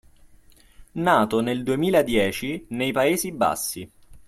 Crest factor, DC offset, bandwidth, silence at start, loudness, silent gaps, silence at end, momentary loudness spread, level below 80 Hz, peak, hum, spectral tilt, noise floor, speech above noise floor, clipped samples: 20 dB; under 0.1%; 15.5 kHz; 0.8 s; -23 LUFS; none; 0.1 s; 10 LU; -50 dBFS; -4 dBFS; none; -4.5 dB/octave; -52 dBFS; 30 dB; under 0.1%